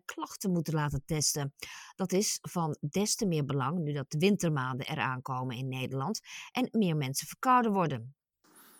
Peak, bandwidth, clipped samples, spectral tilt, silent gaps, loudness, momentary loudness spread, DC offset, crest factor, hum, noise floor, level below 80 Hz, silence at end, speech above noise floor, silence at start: -14 dBFS; 18 kHz; under 0.1%; -4.5 dB/octave; none; -31 LUFS; 10 LU; under 0.1%; 18 dB; none; -62 dBFS; -62 dBFS; 0.2 s; 31 dB; 0.1 s